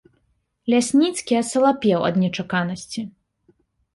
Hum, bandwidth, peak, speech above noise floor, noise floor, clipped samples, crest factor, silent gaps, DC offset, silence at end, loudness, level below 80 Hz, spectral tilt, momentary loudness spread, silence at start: none; 11.5 kHz; -6 dBFS; 48 dB; -68 dBFS; under 0.1%; 16 dB; none; under 0.1%; 0.85 s; -21 LUFS; -62 dBFS; -5 dB/octave; 14 LU; 0.65 s